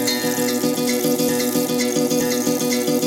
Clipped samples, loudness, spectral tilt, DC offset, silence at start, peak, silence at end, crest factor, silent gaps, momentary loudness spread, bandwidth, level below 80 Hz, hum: under 0.1%; -19 LUFS; -3.5 dB/octave; under 0.1%; 0 s; -6 dBFS; 0 s; 14 dB; none; 1 LU; 17 kHz; -58 dBFS; none